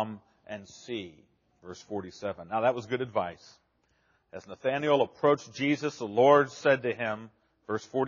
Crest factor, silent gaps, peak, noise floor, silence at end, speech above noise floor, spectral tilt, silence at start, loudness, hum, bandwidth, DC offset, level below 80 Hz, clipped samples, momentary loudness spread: 22 dB; none; -8 dBFS; -71 dBFS; 0 s; 42 dB; -4 dB/octave; 0 s; -29 LUFS; none; 7.2 kHz; under 0.1%; -72 dBFS; under 0.1%; 21 LU